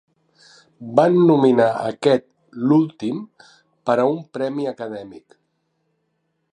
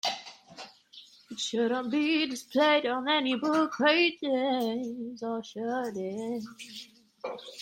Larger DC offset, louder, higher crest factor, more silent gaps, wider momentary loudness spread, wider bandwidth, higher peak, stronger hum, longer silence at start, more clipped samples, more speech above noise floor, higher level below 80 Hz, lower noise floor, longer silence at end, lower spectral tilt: neither; first, -19 LUFS vs -28 LUFS; about the same, 20 dB vs 18 dB; neither; about the same, 17 LU vs 19 LU; second, 10 kHz vs 16.5 kHz; first, -2 dBFS vs -12 dBFS; neither; first, 0.8 s vs 0.05 s; neither; first, 53 dB vs 25 dB; first, -70 dBFS vs -78 dBFS; first, -71 dBFS vs -54 dBFS; first, 1.35 s vs 0 s; first, -7.5 dB/octave vs -3.5 dB/octave